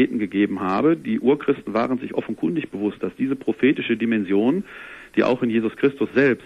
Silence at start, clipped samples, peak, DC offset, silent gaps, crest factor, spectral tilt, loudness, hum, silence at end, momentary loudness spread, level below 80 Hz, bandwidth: 0 s; under 0.1%; -6 dBFS; under 0.1%; none; 16 dB; -8 dB/octave; -22 LUFS; none; 0 s; 7 LU; -58 dBFS; 10 kHz